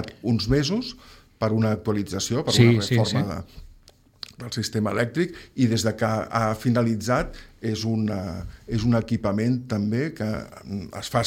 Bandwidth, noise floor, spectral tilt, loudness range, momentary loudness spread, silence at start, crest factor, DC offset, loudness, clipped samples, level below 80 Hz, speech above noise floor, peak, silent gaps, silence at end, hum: 16 kHz; -54 dBFS; -6 dB/octave; 3 LU; 12 LU; 0 s; 20 dB; under 0.1%; -24 LUFS; under 0.1%; -44 dBFS; 31 dB; -4 dBFS; none; 0 s; none